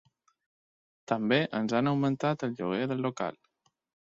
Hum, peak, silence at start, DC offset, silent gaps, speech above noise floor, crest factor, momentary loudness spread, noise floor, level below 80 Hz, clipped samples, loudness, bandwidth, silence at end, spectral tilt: none; -12 dBFS; 1.1 s; under 0.1%; none; over 61 dB; 20 dB; 7 LU; under -90 dBFS; -72 dBFS; under 0.1%; -30 LUFS; 7.8 kHz; 0.8 s; -6.5 dB/octave